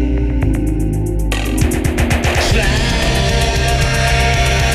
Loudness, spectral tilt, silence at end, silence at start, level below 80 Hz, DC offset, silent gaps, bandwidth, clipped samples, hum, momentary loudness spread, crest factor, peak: -15 LUFS; -4.5 dB/octave; 0 s; 0 s; -18 dBFS; under 0.1%; none; 15 kHz; under 0.1%; none; 5 LU; 12 dB; -2 dBFS